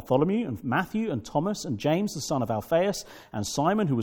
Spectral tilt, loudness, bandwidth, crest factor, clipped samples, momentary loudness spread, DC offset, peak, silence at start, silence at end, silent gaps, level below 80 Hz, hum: -5.5 dB/octave; -27 LUFS; 18 kHz; 18 dB; under 0.1%; 6 LU; under 0.1%; -8 dBFS; 0 s; 0 s; none; -58 dBFS; none